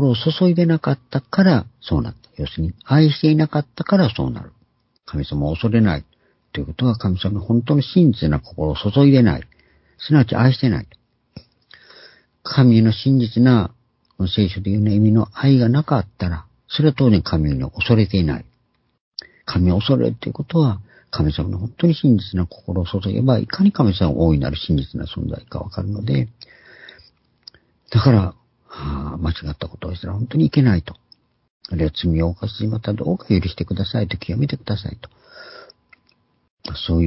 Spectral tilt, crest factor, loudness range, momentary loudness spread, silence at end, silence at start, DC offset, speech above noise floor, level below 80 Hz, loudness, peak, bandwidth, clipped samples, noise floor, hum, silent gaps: -11.5 dB/octave; 18 dB; 5 LU; 14 LU; 0 s; 0 s; under 0.1%; 47 dB; -34 dBFS; -19 LUFS; 0 dBFS; 5.8 kHz; under 0.1%; -65 dBFS; none; 19.00-19.12 s, 31.50-31.60 s, 36.50-36.57 s